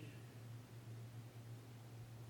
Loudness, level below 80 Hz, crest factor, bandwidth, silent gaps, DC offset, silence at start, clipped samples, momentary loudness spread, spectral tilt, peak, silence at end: -56 LUFS; -76 dBFS; 14 dB; 19 kHz; none; under 0.1%; 0 s; under 0.1%; 2 LU; -6 dB/octave; -40 dBFS; 0 s